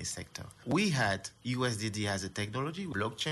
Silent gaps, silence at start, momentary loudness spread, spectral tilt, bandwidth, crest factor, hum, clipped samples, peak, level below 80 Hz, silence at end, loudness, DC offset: none; 0 s; 9 LU; -4.5 dB/octave; 12 kHz; 16 dB; none; under 0.1%; -18 dBFS; -62 dBFS; 0 s; -33 LUFS; under 0.1%